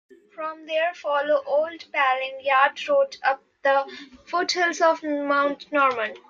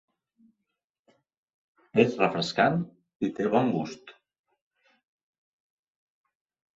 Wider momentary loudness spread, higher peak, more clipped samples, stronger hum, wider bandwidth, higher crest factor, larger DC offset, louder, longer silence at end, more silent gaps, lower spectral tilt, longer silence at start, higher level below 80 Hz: second, 8 LU vs 13 LU; about the same, -6 dBFS vs -6 dBFS; neither; neither; about the same, 7.6 kHz vs 7.8 kHz; second, 18 dB vs 24 dB; neither; first, -23 LUFS vs -26 LUFS; second, 0.1 s vs 2.65 s; second, none vs 3.15-3.20 s; second, -1.5 dB/octave vs -6 dB/octave; second, 0.4 s vs 1.95 s; about the same, -74 dBFS vs -70 dBFS